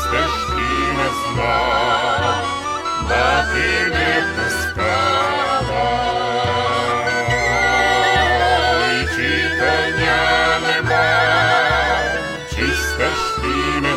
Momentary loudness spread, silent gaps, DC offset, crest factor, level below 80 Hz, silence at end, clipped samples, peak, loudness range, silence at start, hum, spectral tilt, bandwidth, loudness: 5 LU; none; under 0.1%; 14 dB; -32 dBFS; 0 s; under 0.1%; -4 dBFS; 2 LU; 0 s; none; -4 dB/octave; 16 kHz; -17 LUFS